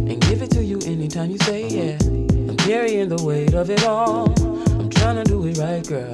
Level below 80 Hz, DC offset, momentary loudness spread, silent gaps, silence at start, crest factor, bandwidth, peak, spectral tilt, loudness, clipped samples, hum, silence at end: -28 dBFS; under 0.1%; 6 LU; none; 0 s; 16 dB; 12.5 kHz; -2 dBFS; -6 dB/octave; -20 LUFS; under 0.1%; none; 0 s